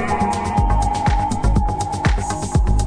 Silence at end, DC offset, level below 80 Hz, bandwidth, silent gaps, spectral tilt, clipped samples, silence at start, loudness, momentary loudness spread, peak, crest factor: 0 s; under 0.1%; -22 dBFS; 10.5 kHz; none; -6 dB/octave; under 0.1%; 0 s; -19 LUFS; 2 LU; -4 dBFS; 14 dB